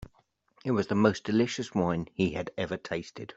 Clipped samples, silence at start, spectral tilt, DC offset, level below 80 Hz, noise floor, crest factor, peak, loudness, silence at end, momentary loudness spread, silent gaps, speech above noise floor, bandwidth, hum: under 0.1%; 0.65 s; -6 dB/octave; under 0.1%; -60 dBFS; -68 dBFS; 22 dB; -8 dBFS; -30 LUFS; 0.05 s; 10 LU; none; 39 dB; 8 kHz; none